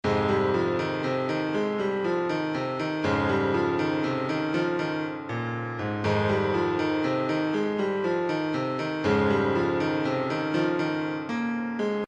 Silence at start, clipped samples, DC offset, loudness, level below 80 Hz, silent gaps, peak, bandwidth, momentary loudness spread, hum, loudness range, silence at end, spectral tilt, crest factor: 0.05 s; under 0.1%; under 0.1%; -27 LUFS; -58 dBFS; none; -12 dBFS; 8.8 kHz; 5 LU; none; 1 LU; 0 s; -7 dB/octave; 14 dB